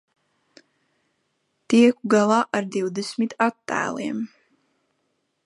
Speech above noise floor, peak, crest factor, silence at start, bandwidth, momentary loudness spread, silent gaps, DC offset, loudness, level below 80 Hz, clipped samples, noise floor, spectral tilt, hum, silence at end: 52 dB; -4 dBFS; 20 dB; 1.7 s; 11.5 kHz; 12 LU; none; under 0.1%; -22 LUFS; -74 dBFS; under 0.1%; -73 dBFS; -5 dB/octave; none; 1.2 s